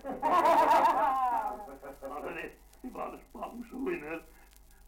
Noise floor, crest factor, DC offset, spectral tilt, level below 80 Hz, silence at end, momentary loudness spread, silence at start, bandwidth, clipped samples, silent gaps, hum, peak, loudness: -57 dBFS; 16 dB; under 0.1%; -4.5 dB/octave; -58 dBFS; 0.6 s; 21 LU; 0.05 s; 17 kHz; under 0.1%; none; none; -14 dBFS; -28 LUFS